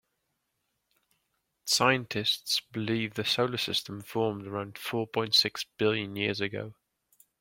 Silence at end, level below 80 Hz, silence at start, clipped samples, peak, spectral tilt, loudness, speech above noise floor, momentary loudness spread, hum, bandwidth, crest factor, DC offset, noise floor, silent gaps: 0.7 s; -70 dBFS; 1.65 s; under 0.1%; -8 dBFS; -3.5 dB/octave; -29 LUFS; 50 dB; 12 LU; none; 16.5 kHz; 24 dB; under 0.1%; -80 dBFS; none